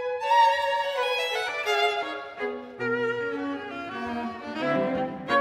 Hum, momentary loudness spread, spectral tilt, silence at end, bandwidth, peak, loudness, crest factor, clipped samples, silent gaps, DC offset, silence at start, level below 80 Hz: none; 12 LU; -4 dB/octave; 0 s; 16 kHz; -10 dBFS; -27 LUFS; 16 dB; under 0.1%; none; under 0.1%; 0 s; -66 dBFS